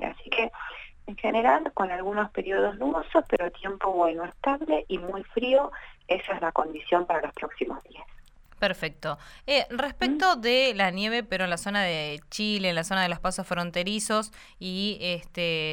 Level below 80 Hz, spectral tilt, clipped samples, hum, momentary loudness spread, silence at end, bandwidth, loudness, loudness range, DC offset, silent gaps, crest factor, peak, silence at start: -50 dBFS; -4 dB/octave; under 0.1%; none; 11 LU; 0 s; 17.5 kHz; -27 LUFS; 4 LU; under 0.1%; none; 20 dB; -6 dBFS; 0 s